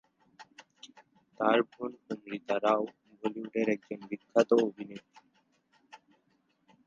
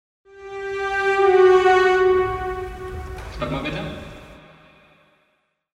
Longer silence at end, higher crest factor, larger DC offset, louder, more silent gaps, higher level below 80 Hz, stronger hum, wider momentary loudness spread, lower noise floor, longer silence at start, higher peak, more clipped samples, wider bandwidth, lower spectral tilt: second, 0.9 s vs 1.4 s; first, 24 dB vs 16 dB; neither; second, -31 LUFS vs -19 LUFS; neither; second, -82 dBFS vs -42 dBFS; neither; about the same, 22 LU vs 20 LU; first, -73 dBFS vs -68 dBFS; about the same, 0.4 s vs 0.35 s; second, -8 dBFS vs -4 dBFS; neither; second, 7.6 kHz vs 8.6 kHz; about the same, -5.5 dB/octave vs -6 dB/octave